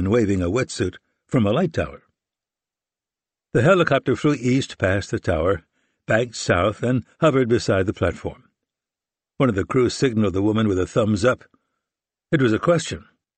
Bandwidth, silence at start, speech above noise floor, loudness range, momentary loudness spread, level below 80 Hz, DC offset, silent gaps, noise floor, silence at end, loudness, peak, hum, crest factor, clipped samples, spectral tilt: 8.8 kHz; 0 s; over 70 dB; 2 LU; 7 LU; -46 dBFS; under 0.1%; none; under -90 dBFS; 0.35 s; -21 LUFS; -4 dBFS; none; 16 dB; under 0.1%; -6 dB/octave